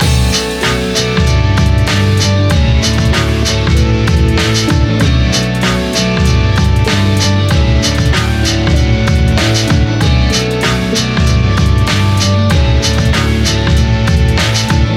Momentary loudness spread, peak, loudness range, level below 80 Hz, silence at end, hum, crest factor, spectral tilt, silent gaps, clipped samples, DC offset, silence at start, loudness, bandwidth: 2 LU; 0 dBFS; 0 LU; -16 dBFS; 0 s; none; 10 dB; -5 dB/octave; none; under 0.1%; under 0.1%; 0 s; -11 LUFS; 16 kHz